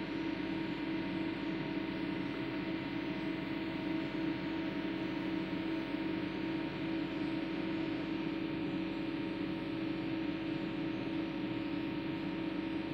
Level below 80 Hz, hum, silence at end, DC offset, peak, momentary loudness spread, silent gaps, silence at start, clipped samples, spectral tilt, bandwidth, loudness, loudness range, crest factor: -60 dBFS; 50 Hz at -55 dBFS; 0 s; under 0.1%; -26 dBFS; 1 LU; none; 0 s; under 0.1%; -7.5 dB/octave; 6.4 kHz; -38 LUFS; 1 LU; 12 dB